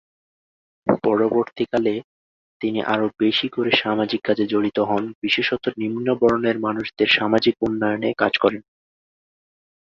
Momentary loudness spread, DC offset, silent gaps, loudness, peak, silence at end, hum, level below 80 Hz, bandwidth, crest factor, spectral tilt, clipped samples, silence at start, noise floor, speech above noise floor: 6 LU; under 0.1%; 2.04-2.60 s, 5.15-5.22 s; -21 LUFS; -2 dBFS; 1.3 s; none; -58 dBFS; 7.2 kHz; 20 dB; -6.5 dB/octave; under 0.1%; 0.85 s; under -90 dBFS; over 70 dB